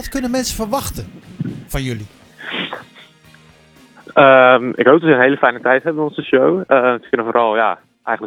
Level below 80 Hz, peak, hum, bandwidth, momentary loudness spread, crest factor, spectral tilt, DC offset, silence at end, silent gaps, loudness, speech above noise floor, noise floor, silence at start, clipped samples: -40 dBFS; 0 dBFS; none; 20 kHz; 17 LU; 16 dB; -5 dB/octave; under 0.1%; 0 s; none; -14 LUFS; 33 dB; -47 dBFS; 0 s; under 0.1%